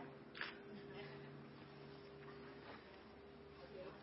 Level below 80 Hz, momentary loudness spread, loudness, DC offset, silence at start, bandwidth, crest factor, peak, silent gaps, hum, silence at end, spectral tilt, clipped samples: -76 dBFS; 10 LU; -55 LUFS; under 0.1%; 0 s; 5.6 kHz; 26 dB; -30 dBFS; none; none; 0 s; -3.5 dB/octave; under 0.1%